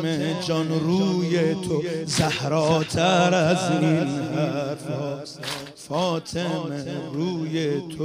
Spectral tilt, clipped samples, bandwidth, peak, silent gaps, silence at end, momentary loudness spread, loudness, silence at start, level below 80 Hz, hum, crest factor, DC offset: -5.5 dB/octave; under 0.1%; 15.5 kHz; -6 dBFS; none; 0 s; 10 LU; -24 LUFS; 0 s; -58 dBFS; none; 18 dB; under 0.1%